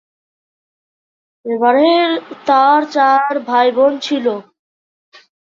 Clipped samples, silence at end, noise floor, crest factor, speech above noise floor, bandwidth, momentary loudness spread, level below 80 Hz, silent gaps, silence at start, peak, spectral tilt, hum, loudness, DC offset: under 0.1%; 1.2 s; under -90 dBFS; 14 dB; over 77 dB; 7.6 kHz; 10 LU; -68 dBFS; none; 1.45 s; -2 dBFS; -4 dB/octave; none; -14 LUFS; under 0.1%